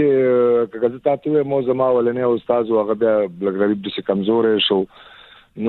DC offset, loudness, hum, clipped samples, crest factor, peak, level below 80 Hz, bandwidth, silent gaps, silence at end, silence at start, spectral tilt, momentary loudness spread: under 0.1%; -18 LUFS; none; under 0.1%; 14 dB; -4 dBFS; -60 dBFS; 4.3 kHz; none; 0 s; 0 s; -9 dB/octave; 6 LU